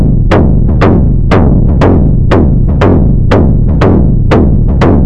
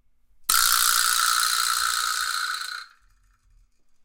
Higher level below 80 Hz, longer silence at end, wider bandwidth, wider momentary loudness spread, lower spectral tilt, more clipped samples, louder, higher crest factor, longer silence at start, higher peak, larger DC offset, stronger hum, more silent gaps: first, -10 dBFS vs -54 dBFS; second, 0 s vs 1.2 s; second, 7.4 kHz vs 17.5 kHz; second, 1 LU vs 12 LU; first, -9.5 dB/octave vs 5 dB/octave; first, 0.5% vs under 0.1%; first, -8 LUFS vs -21 LUFS; second, 6 dB vs 24 dB; second, 0 s vs 0.4 s; about the same, 0 dBFS vs 0 dBFS; first, 10% vs under 0.1%; neither; neither